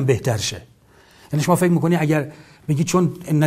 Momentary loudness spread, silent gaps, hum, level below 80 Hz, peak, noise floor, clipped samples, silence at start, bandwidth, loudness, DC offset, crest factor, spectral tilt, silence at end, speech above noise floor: 12 LU; none; none; -54 dBFS; -2 dBFS; -51 dBFS; under 0.1%; 0 s; 15.5 kHz; -20 LUFS; under 0.1%; 18 dB; -6 dB/octave; 0 s; 32 dB